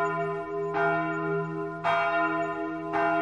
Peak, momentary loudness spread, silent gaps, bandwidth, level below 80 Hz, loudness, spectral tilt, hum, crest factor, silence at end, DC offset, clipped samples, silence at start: -14 dBFS; 6 LU; none; 9.8 kHz; -66 dBFS; -28 LUFS; -7 dB/octave; none; 14 dB; 0 s; under 0.1%; under 0.1%; 0 s